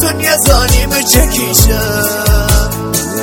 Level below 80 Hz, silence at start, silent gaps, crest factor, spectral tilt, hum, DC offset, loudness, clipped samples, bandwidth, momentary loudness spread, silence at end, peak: -14 dBFS; 0 s; none; 10 dB; -3.5 dB/octave; none; under 0.1%; -10 LUFS; 0.3%; over 20 kHz; 5 LU; 0 s; 0 dBFS